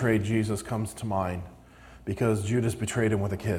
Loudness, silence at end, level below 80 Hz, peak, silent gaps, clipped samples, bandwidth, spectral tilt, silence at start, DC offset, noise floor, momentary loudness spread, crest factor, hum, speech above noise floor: -28 LUFS; 0 s; -52 dBFS; -10 dBFS; none; under 0.1%; 15.5 kHz; -6.5 dB/octave; 0 s; under 0.1%; -50 dBFS; 11 LU; 18 dB; none; 23 dB